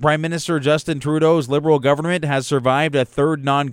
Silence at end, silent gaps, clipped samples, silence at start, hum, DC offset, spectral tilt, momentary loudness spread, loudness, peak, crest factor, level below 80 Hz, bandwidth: 0 s; none; under 0.1%; 0 s; none; under 0.1%; -6 dB/octave; 4 LU; -18 LUFS; -2 dBFS; 14 dB; -52 dBFS; 15 kHz